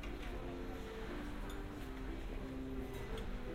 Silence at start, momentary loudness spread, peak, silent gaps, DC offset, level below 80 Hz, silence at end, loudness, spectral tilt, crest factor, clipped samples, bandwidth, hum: 0 s; 2 LU; -32 dBFS; none; under 0.1%; -48 dBFS; 0 s; -47 LUFS; -6 dB/octave; 12 dB; under 0.1%; 16 kHz; none